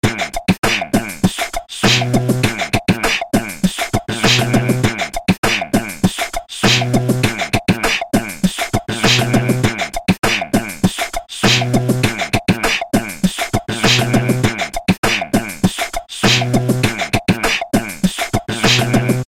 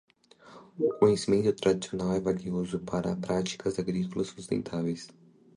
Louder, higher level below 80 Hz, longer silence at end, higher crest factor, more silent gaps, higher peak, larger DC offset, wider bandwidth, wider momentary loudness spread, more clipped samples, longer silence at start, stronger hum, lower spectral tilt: first, -16 LUFS vs -30 LUFS; first, -32 dBFS vs -58 dBFS; second, 0.05 s vs 0.5 s; second, 16 dB vs 22 dB; first, 0.58-0.63 s, 5.38-5.43 s, 14.98-15.03 s vs none; first, 0 dBFS vs -8 dBFS; first, 0.3% vs under 0.1%; first, 16.5 kHz vs 11 kHz; second, 6 LU vs 9 LU; neither; second, 0.05 s vs 0.45 s; neither; second, -4.5 dB/octave vs -6 dB/octave